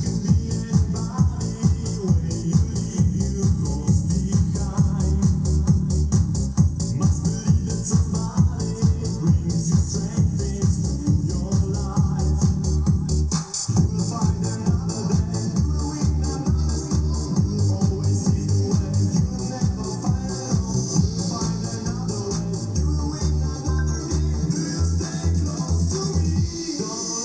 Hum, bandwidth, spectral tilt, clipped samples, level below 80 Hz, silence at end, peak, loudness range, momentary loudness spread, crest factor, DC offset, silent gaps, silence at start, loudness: none; 8 kHz; -6.5 dB/octave; under 0.1%; -28 dBFS; 0 s; -6 dBFS; 3 LU; 4 LU; 16 dB; under 0.1%; none; 0 s; -22 LUFS